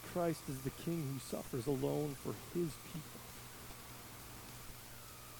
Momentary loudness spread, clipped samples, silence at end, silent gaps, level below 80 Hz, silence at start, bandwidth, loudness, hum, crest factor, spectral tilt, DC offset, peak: 12 LU; under 0.1%; 0 s; none; -62 dBFS; 0 s; 19 kHz; -43 LUFS; none; 18 dB; -5.5 dB/octave; under 0.1%; -24 dBFS